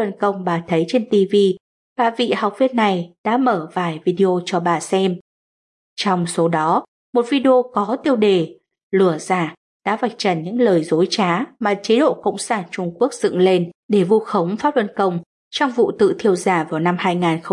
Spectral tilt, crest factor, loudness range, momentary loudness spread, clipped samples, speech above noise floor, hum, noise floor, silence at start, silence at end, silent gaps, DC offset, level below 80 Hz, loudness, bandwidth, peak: -5.5 dB/octave; 14 dB; 2 LU; 7 LU; under 0.1%; over 72 dB; none; under -90 dBFS; 0 s; 0 s; 1.60-1.96 s, 3.18-3.24 s, 5.21-5.96 s, 6.88-7.13 s, 8.83-8.91 s, 9.57-9.80 s, 13.75-13.89 s, 15.26-15.51 s; under 0.1%; -68 dBFS; -18 LUFS; 11.5 kHz; -4 dBFS